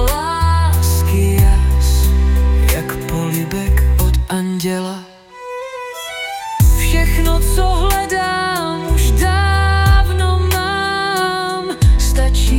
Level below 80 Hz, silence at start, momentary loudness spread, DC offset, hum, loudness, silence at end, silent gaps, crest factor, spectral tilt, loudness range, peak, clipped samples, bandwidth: -16 dBFS; 0 s; 10 LU; under 0.1%; none; -15 LUFS; 0 s; none; 12 dB; -5 dB/octave; 4 LU; -2 dBFS; under 0.1%; 17.5 kHz